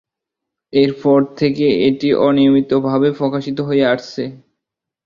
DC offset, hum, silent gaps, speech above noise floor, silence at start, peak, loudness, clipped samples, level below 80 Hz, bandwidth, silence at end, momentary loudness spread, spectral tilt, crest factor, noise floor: under 0.1%; none; none; 67 dB; 0.75 s; -2 dBFS; -15 LUFS; under 0.1%; -54 dBFS; 7 kHz; 0.7 s; 8 LU; -7.5 dB/octave; 14 dB; -81 dBFS